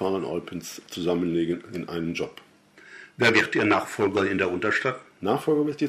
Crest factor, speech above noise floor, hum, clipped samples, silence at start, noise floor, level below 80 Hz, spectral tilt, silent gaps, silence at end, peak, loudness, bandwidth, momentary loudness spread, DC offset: 20 dB; 25 dB; none; under 0.1%; 0 s; -50 dBFS; -62 dBFS; -5 dB/octave; none; 0 s; -4 dBFS; -25 LUFS; 15.5 kHz; 15 LU; under 0.1%